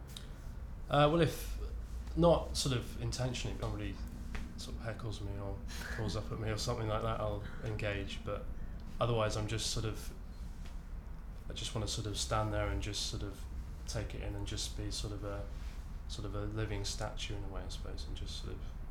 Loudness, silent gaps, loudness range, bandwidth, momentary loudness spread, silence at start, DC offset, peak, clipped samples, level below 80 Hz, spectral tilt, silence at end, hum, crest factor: -38 LUFS; none; 8 LU; 18 kHz; 15 LU; 0 s; under 0.1%; -16 dBFS; under 0.1%; -44 dBFS; -5 dB/octave; 0 s; none; 20 dB